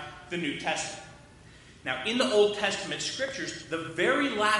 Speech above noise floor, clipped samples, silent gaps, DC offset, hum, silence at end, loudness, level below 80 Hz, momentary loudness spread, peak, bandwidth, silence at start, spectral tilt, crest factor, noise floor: 24 dB; under 0.1%; none; under 0.1%; none; 0 s; -29 LUFS; -62 dBFS; 13 LU; -10 dBFS; 11.5 kHz; 0 s; -3 dB/octave; 18 dB; -52 dBFS